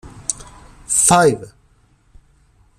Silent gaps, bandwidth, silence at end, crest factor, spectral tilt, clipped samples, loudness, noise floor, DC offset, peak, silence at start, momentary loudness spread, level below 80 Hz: none; 15.5 kHz; 1.3 s; 20 dB; -3 dB/octave; under 0.1%; -15 LUFS; -55 dBFS; under 0.1%; 0 dBFS; 0.05 s; 17 LU; -46 dBFS